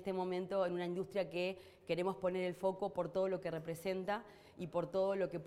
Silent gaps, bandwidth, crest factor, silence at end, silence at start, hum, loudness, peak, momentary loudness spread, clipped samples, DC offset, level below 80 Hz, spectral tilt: none; 15 kHz; 16 dB; 0 s; 0 s; none; -39 LUFS; -24 dBFS; 6 LU; under 0.1%; under 0.1%; -74 dBFS; -6.5 dB/octave